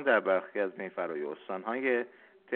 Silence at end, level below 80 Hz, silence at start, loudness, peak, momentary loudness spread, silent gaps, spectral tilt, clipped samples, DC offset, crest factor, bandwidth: 0 s; -84 dBFS; 0 s; -32 LUFS; -14 dBFS; 11 LU; none; -2.5 dB/octave; under 0.1%; under 0.1%; 18 dB; 4.3 kHz